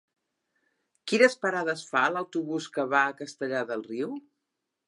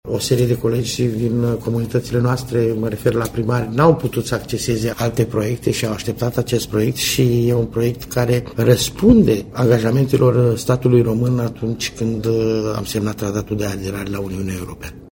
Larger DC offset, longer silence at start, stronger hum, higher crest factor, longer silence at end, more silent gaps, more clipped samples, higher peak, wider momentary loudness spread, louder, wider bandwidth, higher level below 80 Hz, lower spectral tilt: neither; first, 1.05 s vs 0.05 s; neither; first, 24 dB vs 18 dB; first, 0.7 s vs 0.05 s; neither; neither; second, -6 dBFS vs 0 dBFS; first, 13 LU vs 8 LU; second, -27 LUFS vs -18 LUFS; second, 11.5 kHz vs 17 kHz; second, -86 dBFS vs -40 dBFS; second, -4 dB/octave vs -6 dB/octave